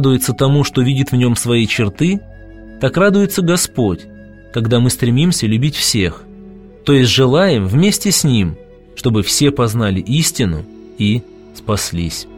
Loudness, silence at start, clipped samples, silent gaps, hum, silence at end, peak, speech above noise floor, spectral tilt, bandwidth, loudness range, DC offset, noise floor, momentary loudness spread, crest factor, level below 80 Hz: -14 LUFS; 0 s; under 0.1%; none; none; 0 s; 0 dBFS; 23 dB; -5 dB/octave; 16.5 kHz; 3 LU; 0.4%; -36 dBFS; 9 LU; 14 dB; -38 dBFS